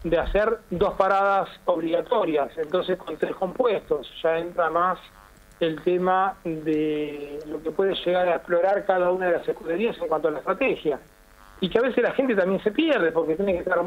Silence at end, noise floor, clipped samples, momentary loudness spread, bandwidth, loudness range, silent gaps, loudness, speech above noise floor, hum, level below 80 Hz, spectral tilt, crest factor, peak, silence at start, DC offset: 0 s; -50 dBFS; under 0.1%; 7 LU; 15.5 kHz; 2 LU; none; -24 LUFS; 27 dB; none; -46 dBFS; -7 dB/octave; 20 dB; -4 dBFS; 0 s; under 0.1%